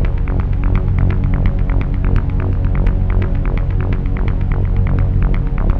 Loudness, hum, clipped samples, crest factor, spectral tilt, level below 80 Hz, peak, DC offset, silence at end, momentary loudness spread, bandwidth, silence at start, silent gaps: -18 LUFS; none; under 0.1%; 12 dB; -10.5 dB/octave; -16 dBFS; -2 dBFS; under 0.1%; 0 s; 3 LU; 3.8 kHz; 0 s; none